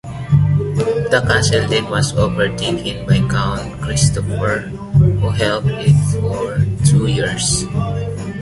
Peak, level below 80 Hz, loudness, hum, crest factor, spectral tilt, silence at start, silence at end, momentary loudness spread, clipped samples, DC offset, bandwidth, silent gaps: 0 dBFS; -32 dBFS; -16 LUFS; none; 14 dB; -5 dB/octave; 0.05 s; 0 s; 7 LU; under 0.1%; under 0.1%; 11.5 kHz; none